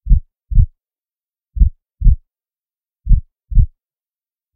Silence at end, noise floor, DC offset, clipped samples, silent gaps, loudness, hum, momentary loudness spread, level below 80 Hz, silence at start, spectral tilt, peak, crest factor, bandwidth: 0.9 s; under -90 dBFS; under 0.1%; under 0.1%; none; -19 LUFS; none; 5 LU; -16 dBFS; 0.05 s; -15.5 dB/octave; 0 dBFS; 16 dB; 0.4 kHz